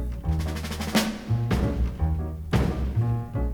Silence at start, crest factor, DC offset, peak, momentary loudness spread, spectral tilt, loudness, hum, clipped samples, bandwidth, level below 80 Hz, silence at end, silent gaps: 0 s; 18 dB; under 0.1%; -8 dBFS; 4 LU; -6 dB/octave; -27 LUFS; none; under 0.1%; over 20 kHz; -32 dBFS; 0 s; none